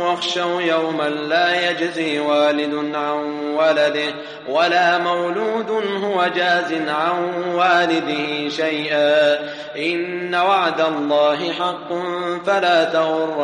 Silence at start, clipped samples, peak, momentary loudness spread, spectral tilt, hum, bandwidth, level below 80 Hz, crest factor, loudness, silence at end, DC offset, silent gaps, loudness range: 0 s; under 0.1%; -4 dBFS; 7 LU; -4.5 dB/octave; none; 10 kHz; -72 dBFS; 16 dB; -19 LUFS; 0 s; under 0.1%; none; 1 LU